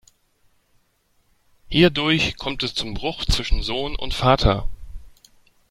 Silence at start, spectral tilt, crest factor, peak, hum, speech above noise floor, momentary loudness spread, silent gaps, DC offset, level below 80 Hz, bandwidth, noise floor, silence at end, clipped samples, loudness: 1.7 s; -5 dB/octave; 22 dB; 0 dBFS; none; 44 dB; 10 LU; none; under 0.1%; -30 dBFS; 16 kHz; -64 dBFS; 0.65 s; under 0.1%; -21 LUFS